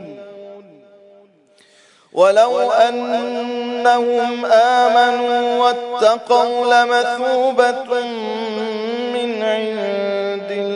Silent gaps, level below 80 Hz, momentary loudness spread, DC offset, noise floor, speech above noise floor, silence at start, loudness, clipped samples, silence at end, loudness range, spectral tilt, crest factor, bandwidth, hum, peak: none; -74 dBFS; 10 LU; under 0.1%; -52 dBFS; 37 dB; 0 s; -16 LUFS; under 0.1%; 0 s; 4 LU; -3.5 dB/octave; 16 dB; 10.5 kHz; none; -2 dBFS